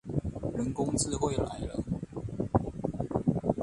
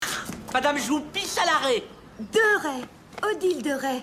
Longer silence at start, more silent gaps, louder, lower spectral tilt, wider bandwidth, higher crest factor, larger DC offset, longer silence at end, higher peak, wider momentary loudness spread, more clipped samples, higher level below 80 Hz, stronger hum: about the same, 0.05 s vs 0 s; neither; second, -32 LUFS vs -25 LUFS; first, -6 dB/octave vs -2.5 dB/octave; second, 11.5 kHz vs 16 kHz; first, 22 dB vs 16 dB; neither; about the same, 0 s vs 0 s; about the same, -10 dBFS vs -10 dBFS; second, 7 LU vs 12 LU; neither; first, -46 dBFS vs -58 dBFS; neither